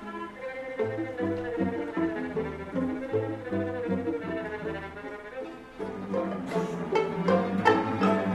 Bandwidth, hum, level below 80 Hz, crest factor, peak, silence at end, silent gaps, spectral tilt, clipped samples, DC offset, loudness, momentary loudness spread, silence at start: 12 kHz; none; -58 dBFS; 22 dB; -8 dBFS; 0 s; none; -7.5 dB/octave; under 0.1%; under 0.1%; -30 LUFS; 14 LU; 0 s